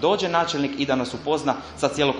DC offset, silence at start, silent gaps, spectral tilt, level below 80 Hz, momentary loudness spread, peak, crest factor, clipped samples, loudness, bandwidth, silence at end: under 0.1%; 0 s; none; -4.5 dB/octave; -52 dBFS; 4 LU; -4 dBFS; 20 dB; under 0.1%; -24 LUFS; 11.5 kHz; 0 s